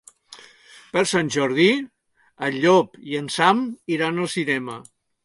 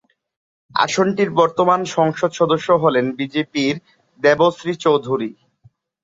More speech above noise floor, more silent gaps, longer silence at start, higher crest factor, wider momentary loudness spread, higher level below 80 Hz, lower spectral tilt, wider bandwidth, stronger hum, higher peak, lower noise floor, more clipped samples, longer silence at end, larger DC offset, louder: second, 28 dB vs 38 dB; neither; second, 0.3 s vs 0.75 s; about the same, 20 dB vs 16 dB; first, 11 LU vs 8 LU; second, -68 dBFS vs -62 dBFS; about the same, -4.5 dB/octave vs -5 dB/octave; first, 11.5 kHz vs 7.8 kHz; neither; about the same, -2 dBFS vs -2 dBFS; second, -49 dBFS vs -55 dBFS; neither; second, 0.45 s vs 0.7 s; neither; second, -21 LUFS vs -18 LUFS